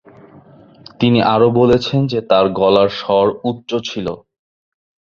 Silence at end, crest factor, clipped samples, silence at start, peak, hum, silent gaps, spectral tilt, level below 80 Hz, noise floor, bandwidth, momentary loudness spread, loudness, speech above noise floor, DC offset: 0.9 s; 16 dB; under 0.1%; 1 s; 0 dBFS; none; none; -7 dB/octave; -46 dBFS; -43 dBFS; 7.2 kHz; 11 LU; -15 LUFS; 29 dB; under 0.1%